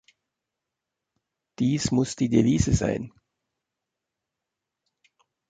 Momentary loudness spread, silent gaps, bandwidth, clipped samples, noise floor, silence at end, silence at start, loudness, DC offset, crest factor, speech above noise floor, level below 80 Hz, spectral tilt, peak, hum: 9 LU; none; 9.4 kHz; under 0.1%; -85 dBFS; 2.4 s; 1.6 s; -24 LUFS; under 0.1%; 20 dB; 63 dB; -44 dBFS; -6 dB/octave; -8 dBFS; none